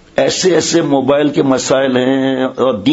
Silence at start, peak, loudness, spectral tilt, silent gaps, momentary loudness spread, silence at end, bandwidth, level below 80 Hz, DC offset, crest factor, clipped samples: 0.15 s; 0 dBFS; -13 LUFS; -4.5 dB/octave; none; 3 LU; 0 s; 8 kHz; -52 dBFS; under 0.1%; 12 dB; under 0.1%